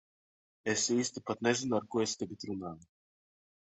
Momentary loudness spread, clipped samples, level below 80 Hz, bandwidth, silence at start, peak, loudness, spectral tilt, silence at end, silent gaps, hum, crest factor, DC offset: 11 LU; under 0.1%; -70 dBFS; 8.4 kHz; 0.65 s; -14 dBFS; -33 LUFS; -3.5 dB/octave; 0.85 s; none; none; 20 dB; under 0.1%